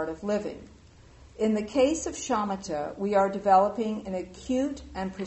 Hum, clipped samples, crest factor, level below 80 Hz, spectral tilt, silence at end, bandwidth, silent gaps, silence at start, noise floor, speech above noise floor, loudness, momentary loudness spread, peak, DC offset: none; under 0.1%; 18 dB; -52 dBFS; -5 dB/octave; 0 s; 8.2 kHz; none; 0 s; -52 dBFS; 25 dB; -27 LUFS; 13 LU; -8 dBFS; under 0.1%